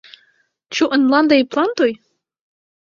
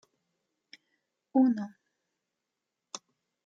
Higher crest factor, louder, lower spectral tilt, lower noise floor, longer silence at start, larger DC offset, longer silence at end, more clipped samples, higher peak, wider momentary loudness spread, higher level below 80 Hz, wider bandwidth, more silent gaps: about the same, 16 dB vs 20 dB; first, -16 LUFS vs -28 LUFS; second, -3.5 dB/octave vs -5.5 dB/octave; second, -61 dBFS vs -86 dBFS; second, 0.7 s vs 1.35 s; neither; first, 0.95 s vs 0.5 s; neither; first, -2 dBFS vs -14 dBFS; second, 10 LU vs 19 LU; first, -64 dBFS vs -88 dBFS; about the same, 7.4 kHz vs 7.8 kHz; neither